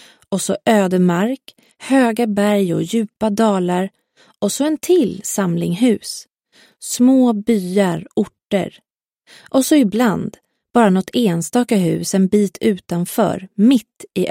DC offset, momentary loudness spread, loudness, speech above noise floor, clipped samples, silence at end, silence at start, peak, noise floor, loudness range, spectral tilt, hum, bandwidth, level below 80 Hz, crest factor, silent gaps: under 0.1%; 9 LU; -17 LUFS; 37 dB; under 0.1%; 0 s; 0.3 s; -2 dBFS; -53 dBFS; 2 LU; -5.5 dB/octave; none; 16.5 kHz; -58 dBFS; 16 dB; none